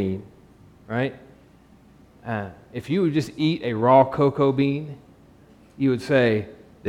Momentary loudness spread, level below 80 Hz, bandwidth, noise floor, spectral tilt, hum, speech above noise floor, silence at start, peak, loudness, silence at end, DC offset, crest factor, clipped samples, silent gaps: 18 LU; -58 dBFS; 12.5 kHz; -52 dBFS; -7.5 dB/octave; none; 31 dB; 0 s; -2 dBFS; -22 LUFS; 0 s; under 0.1%; 20 dB; under 0.1%; none